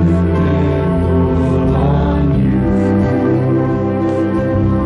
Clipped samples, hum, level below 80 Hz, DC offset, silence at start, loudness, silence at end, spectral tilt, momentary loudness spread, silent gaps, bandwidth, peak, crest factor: under 0.1%; none; -24 dBFS; under 0.1%; 0 s; -14 LUFS; 0 s; -10 dB/octave; 2 LU; none; 7.4 kHz; -4 dBFS; 10 dB